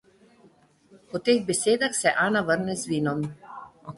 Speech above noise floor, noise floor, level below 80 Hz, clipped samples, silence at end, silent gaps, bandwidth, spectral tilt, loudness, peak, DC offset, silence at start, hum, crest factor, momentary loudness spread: 34 dB; -58 dBFS; -64 dBFS; under 0.1%; 0 s; none; 12 kHz; -4 dB/octave; -25 LUFS; -6 dBFS; under 0.1%; 0.95 s; none; 20 dB; 15 LU